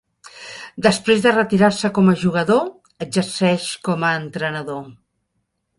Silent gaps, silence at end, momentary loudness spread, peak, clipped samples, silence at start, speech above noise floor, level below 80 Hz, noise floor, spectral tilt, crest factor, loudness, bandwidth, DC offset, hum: none; 0.85 s; 17 LU; -2 dBFS; under 0.1%; 0.25 s; 54 dB; -56 dBFS; -72 dBFS; -5.5 dB/octave; 18 dB; -18 LUFS; 11.5 kHz; under 0.1%; none